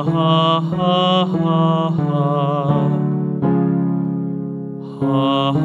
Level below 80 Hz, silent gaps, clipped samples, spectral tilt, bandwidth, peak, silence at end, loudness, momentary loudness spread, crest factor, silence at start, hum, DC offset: -58 dBFS; none; under 0.1%; -8.5 dB/octave; 7.2 kHz; -4 dBFS; 0 s; -17 LUFS; 8 LU; 14 dB; 0 s; none; under 0.1%